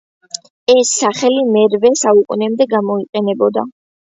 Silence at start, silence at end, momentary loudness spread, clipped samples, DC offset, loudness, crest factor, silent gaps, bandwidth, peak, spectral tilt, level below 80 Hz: 0.7 s; 0.35 s; 13 LU; under 0.1%; under 0.1%; -14 LUFS; 14 dB; 3.09-3.13 s; 8 kHz; 0 dBFS; -3.5 dB/octave; -62 dBFS